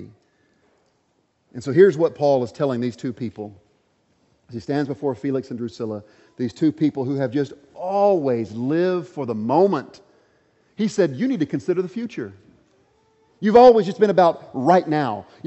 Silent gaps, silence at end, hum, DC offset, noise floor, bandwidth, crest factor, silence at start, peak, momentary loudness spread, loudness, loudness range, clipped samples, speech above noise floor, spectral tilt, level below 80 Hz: none; 0.25 s; none; under 0.1%; -67 dBFS; 8.2 kHz; 20 dB; 0 s; -2 dBFS; 16 LU; -20 LUFS; 9 LU; under 0.1%; 47 dB; -7.5 dB/octave; -62 dBFS